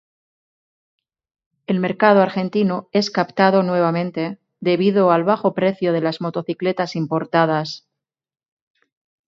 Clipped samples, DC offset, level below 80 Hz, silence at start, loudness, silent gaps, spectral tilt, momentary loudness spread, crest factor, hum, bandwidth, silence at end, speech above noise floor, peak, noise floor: under 0.1%; under 0.1%; -68 dBFS; 1.7 s; -19 LUFS; none; -7 dB/octave; 10 LU; 20 dB; none; 7.4 kHz; 1.5 s; 68 dB; 0 dBFS; -86 dBFS